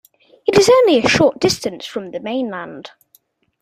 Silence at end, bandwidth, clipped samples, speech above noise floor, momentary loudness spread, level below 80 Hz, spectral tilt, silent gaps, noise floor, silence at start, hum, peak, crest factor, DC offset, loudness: 0.75 s; 15 kHz; under 0.1%; 42 dB; 17 LU; -50 dBFS; -4 dB/octave; none; -57 dBFS; 0.45 s; none; 0 dBFS; 16 dB; under 0.1%; -15 LUFS